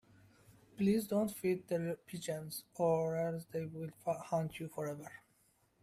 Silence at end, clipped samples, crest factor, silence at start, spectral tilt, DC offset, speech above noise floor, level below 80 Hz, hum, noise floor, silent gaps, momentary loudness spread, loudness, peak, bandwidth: 0.65 s; under 0.1%; 18 dB; 0.75 s; -6.5 dB/octave; under 0.1%; 36 dB; -72 dBFS; none; -73 dBFS; none; 10 LU; -38 LUFS; -22 dBFS; 15.5 kHz